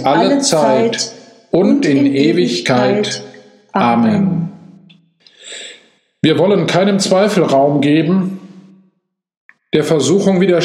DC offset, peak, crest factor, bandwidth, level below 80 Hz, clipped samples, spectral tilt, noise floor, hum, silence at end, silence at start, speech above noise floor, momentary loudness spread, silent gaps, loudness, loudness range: under 0.1%; 0 dBFS; 14 dB; 13.5 kHz; -58 dBFS; under 0.1%; -5.5 dB/octave; -64 dBFS; none; 0 s; 0 s; 52 dB; 12 LU; 9.37-9.49 s; -13 LUFS; 3 LU